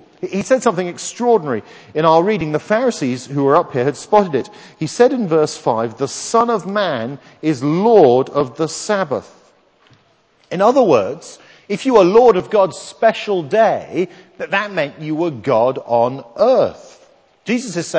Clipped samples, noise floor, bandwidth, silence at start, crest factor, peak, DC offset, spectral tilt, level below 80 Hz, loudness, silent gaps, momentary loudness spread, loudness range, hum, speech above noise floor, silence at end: under 0.1%; -56 dBFS; 8 kHz; 0.2 s; 16 dB; 0 dBFS; under 0.1%; -5.5 dB/octave; -58 dBFS; -16 LUFS; none; 12 LU; 3 LU; none; 40 dB; 0 s